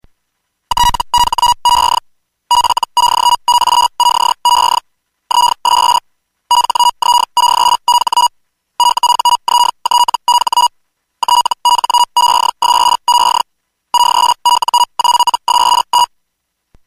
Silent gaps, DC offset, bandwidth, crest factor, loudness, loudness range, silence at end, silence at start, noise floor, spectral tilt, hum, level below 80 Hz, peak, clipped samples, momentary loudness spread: none; under 0.1%; 15.5 kHz; 10 dB; -11 LUFS; 1 LU; 0.8 s; 0.7 s; -70 dBFS; 1 dB/octave; none; -38 dBFS; -2 dBFS; under 0.1%; 4 LU